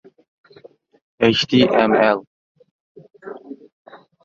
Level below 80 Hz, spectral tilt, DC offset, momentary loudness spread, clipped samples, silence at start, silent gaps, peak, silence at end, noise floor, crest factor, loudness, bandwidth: -58 dBFS; -5.5 dB/octave; under 0.1%; 25 LU; under 0.1%; 1.2 s; 2.27-2.55 s, 2.71-2.95 s, 3.72-3.85 s; 0 dBFS; 0.3 s; -48 dBFS; 20 dB; -16 LUFS; 7.6 kHz